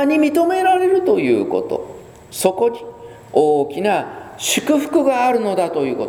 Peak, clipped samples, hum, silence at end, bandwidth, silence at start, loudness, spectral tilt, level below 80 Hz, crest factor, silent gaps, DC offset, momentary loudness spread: 0 dBFS; under 0.1%; none; 0 s; over 20 kHz; 0 s; -17 LUFS; -4 dB/octave; -58 dBFS; 18 dB; none; under 0.1%; 11 LU